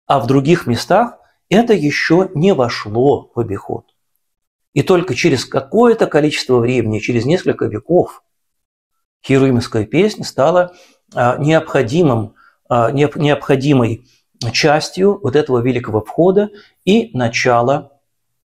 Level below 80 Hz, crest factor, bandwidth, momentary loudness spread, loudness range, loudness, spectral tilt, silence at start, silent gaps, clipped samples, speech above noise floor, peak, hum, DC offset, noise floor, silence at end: -46 dBFS; 14 dB; 14.5 kHz; 9 LU; 3 LU; -15 LUFS; -6 dB/octave; 0.1 s; 4.47-4.59 s, 4.68-4.72 s, 8.65-8.90 s, 9.05-9.20 s; under 0.1%; 50 dB; 0 dBFS; none; under 0.1%; -64 dBFS; 0.65 s